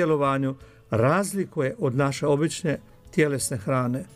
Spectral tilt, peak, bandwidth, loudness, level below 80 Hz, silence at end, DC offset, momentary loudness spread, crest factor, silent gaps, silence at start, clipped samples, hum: -6 dB/octave; -8 dBFS; 15.5 kHz; -25 LUFS; -56 dBFS; 0.1 s; under 0.1%; 8 LU; 16 dB; none; 0 s; under 0.1%; none